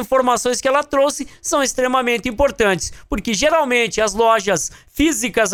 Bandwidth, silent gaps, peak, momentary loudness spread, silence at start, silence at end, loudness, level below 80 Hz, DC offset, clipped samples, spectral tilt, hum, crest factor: 18 kHz; none; -2 dBFS; 6 LU; 0 s; 0 s; -17 LUFS; -38 dBFS; under 0.1%; under 0.1%; -2.5 dB/octave; none; 16 dB